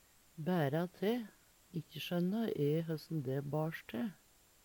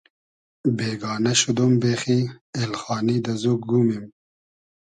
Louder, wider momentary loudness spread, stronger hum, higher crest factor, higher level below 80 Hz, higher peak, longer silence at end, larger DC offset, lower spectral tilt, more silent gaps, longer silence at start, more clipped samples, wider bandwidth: second, -38 LUFS vs -22 LUFS; first, 11 LU vs 8 LU; neither; about the same, 16 dB vs 18 dB; second, -76 dBFS vs -62 dBFS; second, -22 dBFS vs -6 dBFS; second, 0.5 s vs 0.8 s; neither; first, -7.5 dB/octave vs -5 dB/octave; second, none vs 2.41-2.53 s; second, 0.35 s vs 0.65 s; neither; first, 19 kHz vs 10.5 kHz